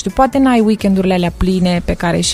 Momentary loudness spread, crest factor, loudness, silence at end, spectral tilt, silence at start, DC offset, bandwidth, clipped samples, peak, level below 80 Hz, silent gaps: 4 LU; 12 dB; -14 LUFS; 0 s; -5.5 dB/octave; 0 s; under 0.1%; 14.5 kHz; under 0.1%; 0 dBFS; -28 dBFS; none